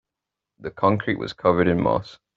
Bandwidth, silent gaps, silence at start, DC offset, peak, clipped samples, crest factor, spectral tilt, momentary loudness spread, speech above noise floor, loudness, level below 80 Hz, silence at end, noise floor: 7.6 kHz; none; 0.6 s; under 0.1%; -4 dBFS; under 0.1%; 20 dB; -5.5 dB/octave; 11 LU; 64 dB; -22 LUFS; -52 dBFS; 0.2 s; -86 dBFS